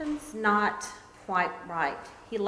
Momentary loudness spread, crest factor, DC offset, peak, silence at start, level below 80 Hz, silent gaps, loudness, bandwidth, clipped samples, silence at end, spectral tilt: 16 LU; 18 dB; under 0.1%; -12 dBFS; 0 s; -60 dBFS; none; -29 LUFS; 11 kHz; under 0.1%; 0 s; -4.5 dB/octave